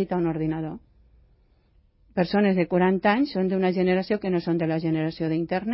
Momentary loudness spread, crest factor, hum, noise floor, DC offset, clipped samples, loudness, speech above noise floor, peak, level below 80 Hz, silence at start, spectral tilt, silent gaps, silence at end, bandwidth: 7 LU; 16 dB; none; -61 dBFS; under 0.1%; under 0.1%; -24 LUFS; 37 dB; -10 dBFS; -56 dBFS; 0 s; -11.5 dB/octave; none; 0 s; 5.8 kHz